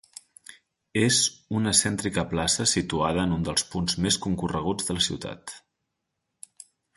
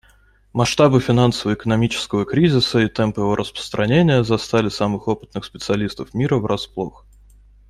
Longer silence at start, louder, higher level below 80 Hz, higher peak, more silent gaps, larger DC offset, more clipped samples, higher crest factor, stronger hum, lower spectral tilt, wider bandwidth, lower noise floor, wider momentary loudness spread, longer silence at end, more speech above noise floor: about the same, 0.5 s vs 0.55 s; second, -24 LUFS vs -19 LUFS; about the same, -48 dBFS vs -46 dBFS; second, -6 dBFS vs -2 dBFS; neither; neither; neither; about the same, 22 dB vs 18 dB; neither; second, -3 dB/octave vs -6 dB/octave; second, 12 kHz vs 13.5 kHz; first, -81 dBFS vs -54 dBFS; first, 16 LU vs 11 LU; first, 1.4 s vs 0.8 s; first, 55 dB vs 35 dB